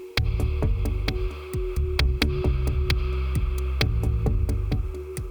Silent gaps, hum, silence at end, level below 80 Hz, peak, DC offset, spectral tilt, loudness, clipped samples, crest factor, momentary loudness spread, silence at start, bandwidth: none; none; 0 s; -26 dBFS; -4 dBFS; under 0.1%; -6 dB/octave; -26 LUFS; under 0.1%; 20 dB; 6 LU; 0 s; over 20 kHz